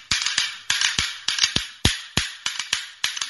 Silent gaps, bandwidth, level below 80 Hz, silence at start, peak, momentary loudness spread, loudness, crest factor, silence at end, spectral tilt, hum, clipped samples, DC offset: none; 12 kHz; -42 dBFS; 0 s; 0 dBFS; 6 LU; -22 LUFS; 24 dB; 0 s; -1 dB/octave; none; under 0.1%; under 0.1%